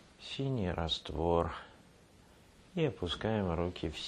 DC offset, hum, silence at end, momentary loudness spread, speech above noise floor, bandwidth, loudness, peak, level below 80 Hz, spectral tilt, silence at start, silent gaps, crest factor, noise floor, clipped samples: under 0.1%; none; 0 s; 11 LU; 26 dB; 11.5 kHz; -35 LUFS; -16 dBFS; -50 dBFS; -6.5 dB/octave; 0.2 s; none; 20 dB; -61 dBFS; under 0.1%